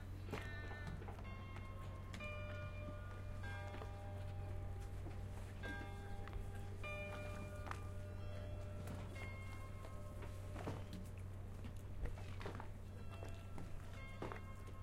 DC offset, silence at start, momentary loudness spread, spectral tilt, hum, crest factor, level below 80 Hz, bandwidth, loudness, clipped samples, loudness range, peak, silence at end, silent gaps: under 0.1%; 0 s; 4 LU; -6.5 dB/octave; none; 18 dB; -54 dBFS; 15.5 kHz; -51 LUFS; under 0.1%; 2 LU; -30 dBFS; 0 s; none